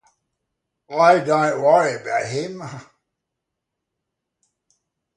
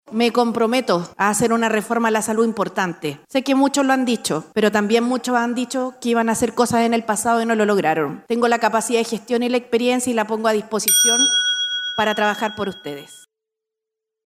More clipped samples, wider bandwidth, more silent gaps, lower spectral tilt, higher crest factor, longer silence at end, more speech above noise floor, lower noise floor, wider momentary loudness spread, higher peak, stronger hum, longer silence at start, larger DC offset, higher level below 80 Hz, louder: neither; second, 10.5 kHz vs 16 kHz; neither; first, -5 dB/octave vs -2.5 dB/octave; about the same, 20 dB vs 16 dB; first, 2.35 s vs 1.1 s; about the same, 63 dB vs 64 dB; about the same, -81 dBFS vs -83 dBFS; first, 19 LU vs 7 LU; about the same, -2 dBFS vs -2 dBFS; neither; first, 0.9 s vs 0.1 s; neither; second, -70 dBFS vs -60 dBFS; about the same, -18 LUFS vs -19 LUFS